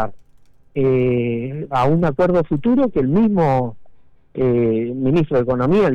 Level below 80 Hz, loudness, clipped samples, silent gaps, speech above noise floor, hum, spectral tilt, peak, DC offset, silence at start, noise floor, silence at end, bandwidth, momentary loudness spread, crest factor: -40 dBFS; -18 LUFS; under 0.1%; none; 35 dB; none; -9.5 dB/octave; -8 dBFS; under 0.1%; 0 s; -52 dBFS; 0 s; 7.8 kHz; 7 LU; 8 dB